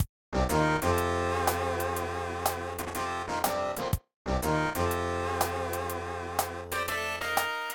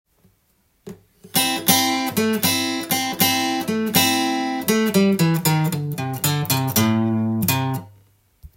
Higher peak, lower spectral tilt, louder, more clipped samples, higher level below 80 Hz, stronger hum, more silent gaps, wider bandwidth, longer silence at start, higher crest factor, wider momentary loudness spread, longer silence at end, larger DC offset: second, -12 dBFS vs -2 dBFS; about the same, -4.5 dB/octave vs -4 dB/octave; second, -30 LUFS vs -19 LUFS; neither; first, -44 dBFS vs -58 dBFS; neither; first, 0.09-0.32 s, 4.16-4.25 s vs none; about the same, 18 kHz vs 17 kHz; second, 0 s vs 0.85 s; about the same, 18 dB vs 20 dB; about the same, 7 LU vs 6 LU; about the same, 0 s vs 0.1 s; neither